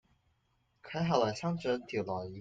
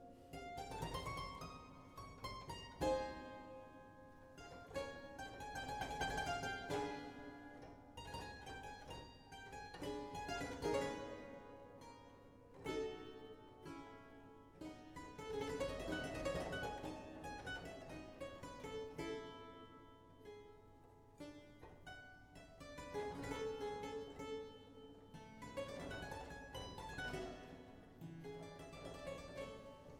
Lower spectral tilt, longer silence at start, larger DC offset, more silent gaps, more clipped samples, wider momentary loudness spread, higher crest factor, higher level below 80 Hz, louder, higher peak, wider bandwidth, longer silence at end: first, -6 dB/octave vs -4.5 dB/octave; first, 0.85 s vs 0 s; neither; neither; neither; second, 8 LU vs 16 LU; about the same, 22 dB vs 20 dB; second, -68 dBFS vs -62 dBFS; first, -34 LUFS vs -49 LUFS; first, -14 dBFS vs -28 dBFS; second, 7.8 kHz vs 19 kHz; about the same, 0 s vs 0 s